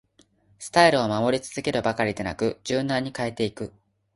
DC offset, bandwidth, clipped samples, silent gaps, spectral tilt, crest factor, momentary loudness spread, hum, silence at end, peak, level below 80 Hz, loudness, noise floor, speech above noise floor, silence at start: under 0.1%; 11.5 kHz; under 0.1%; none; -4.5 dB/octave; 22 dB; 11 LU; none; 0.45 s; -4 dBFS; -56 dBFS; -24 LUFS; -61 dBFS; 37 dB; 0.6 s